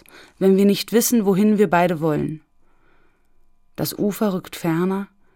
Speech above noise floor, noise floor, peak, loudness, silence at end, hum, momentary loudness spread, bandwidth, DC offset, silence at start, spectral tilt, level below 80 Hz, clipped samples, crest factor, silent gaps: 36 dB; -55 dBFS; -4 dBFS; -19 LUFS; 0.3 s; none; 12 LU; 18 kHz; under 0.1%; 0.4 s; -5.5 dB/octave; -56 dBFS; under 0.1%; 16 dB; none